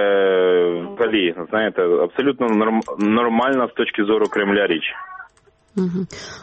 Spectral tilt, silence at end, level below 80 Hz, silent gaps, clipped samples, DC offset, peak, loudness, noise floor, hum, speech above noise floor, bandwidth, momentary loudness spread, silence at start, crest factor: -6 dB/octave; 0 s; -60 dBFS; none; under 0.1%; under 0.1%; -6 dBFS; -19 LUFS; -55 dBFS; none; 36 dB; 8.4 kHz; 10 LU; 0 s; 14 dB